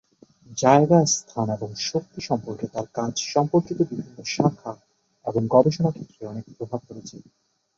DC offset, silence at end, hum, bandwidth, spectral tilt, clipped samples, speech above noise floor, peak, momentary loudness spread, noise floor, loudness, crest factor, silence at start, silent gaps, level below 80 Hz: under 0.1%; 0.6 s; none; 8 kHz; -5.5 dB/octave; under 0.1%; 28 dB; -2 dBFS; 18 LU; -51 dBFS; -23 LUFS; 20 dB; 0.5 s; none; -62 dBFS